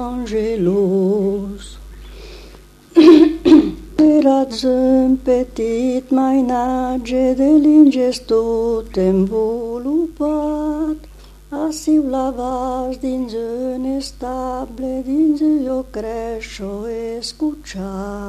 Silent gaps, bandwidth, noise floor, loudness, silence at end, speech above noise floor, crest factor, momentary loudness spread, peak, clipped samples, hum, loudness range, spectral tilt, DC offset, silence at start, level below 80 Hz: none; 12.5 kHz; -41 dBFS; -16 LUFS; 0 s; 24 dB; 16 dB; 15 LU; 0 dBFS; under 0.1%; 50 Hz at -40 dBFS; 8 LU; -6.5 dB/octave; under 0.1%; 0 s; -38 dBFS